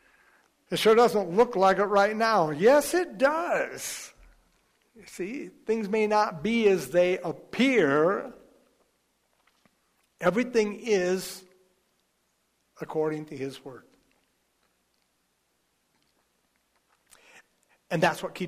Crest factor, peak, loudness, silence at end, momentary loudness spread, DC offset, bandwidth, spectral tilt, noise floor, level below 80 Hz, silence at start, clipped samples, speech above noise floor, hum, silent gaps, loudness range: 18 dB; -10 dBFS; -25 LUFS; 0 s; 16 LU; under 0.1%; 15.5 kHz; -4.5 dB/octave; -73 dBFS; -66 dBFS; 0.7 s; under 0.1%; 48 dB; none; none; 14 LU